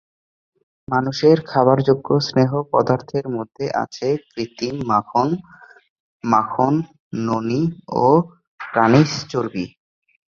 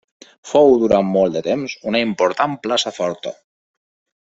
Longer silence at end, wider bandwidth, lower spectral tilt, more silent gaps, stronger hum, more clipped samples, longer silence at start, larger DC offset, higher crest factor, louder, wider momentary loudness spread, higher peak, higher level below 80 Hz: second, 0.7 s vs 0.9 s; about the same, 7.4 kHz vs 8 kHz; first, -7 dB/octave vs -5 dB/octave; first, 5.90-6.20 s, 7.00-7.11 s, 8.47-8.58 s vs none; neither; neither; first, 0.9 s vs 0.45 s; neither; about the same, 18 dB vs 16 dB; about the same, -19 LUFS vs -17 LUFS; about the same, 12 LU vs 11 LU; about the same, -2 dBFS vs -2 dBFS; about the same, -56 dBFS vs -54 dBFS